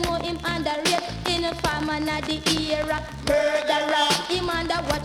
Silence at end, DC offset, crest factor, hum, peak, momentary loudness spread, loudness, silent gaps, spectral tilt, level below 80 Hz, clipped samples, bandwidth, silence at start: 0 s; under 0.1%; 18 dB; none; -6 dBFS; 5 LU; -24 LUFS; none; -3.5 dB/octave; -40 dBFS; under 0.1%; 17.5 kHz; 0 s